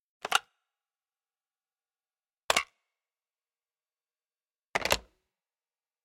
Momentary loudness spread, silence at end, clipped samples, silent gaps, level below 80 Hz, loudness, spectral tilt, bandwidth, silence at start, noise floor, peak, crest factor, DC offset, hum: 6 LU; 1.05 s; under 0.1%; 2.44-2.48 s; -62 dBFS; -30 LUFS; -0.5 dB/octave; 16.5 kHz; 0.25 s; under -90 dBFS; -4 dBFS; 34 dB; under 0.1%; none